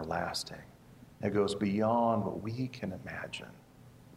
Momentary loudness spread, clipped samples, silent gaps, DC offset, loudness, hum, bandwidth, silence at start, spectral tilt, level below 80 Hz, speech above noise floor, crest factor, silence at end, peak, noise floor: 15 LU; under 0.1%; none; under 0.1%; -34 LUFS; none; 15.5 kHz; 0 s; -6 dB/octave; -64 dBFS; 23 dB; 18 dB; 0 s; -16 dBFS; -56 dBFS